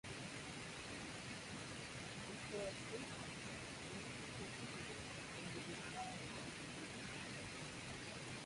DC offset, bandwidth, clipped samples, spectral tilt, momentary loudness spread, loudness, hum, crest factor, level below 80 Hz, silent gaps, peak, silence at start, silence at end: under 0.1%; 11.5 kHz; under 0.1%; -3.5 dB/octave; 2 LU; -49 LUFS; none; 16 dB; -68 dBFS; none; -34 dBFS; 0.05 s; 0 s